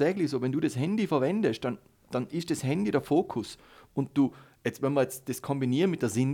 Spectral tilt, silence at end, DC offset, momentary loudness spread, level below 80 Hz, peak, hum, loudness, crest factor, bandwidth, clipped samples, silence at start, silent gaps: -6.5 dB/octave; 0 s; under 0.1%; 9 LU; -66 dBFS; -12 dBFS; none; -29 LUFS; 16 dB; 18 kHz; under 0.1%; 0 s; none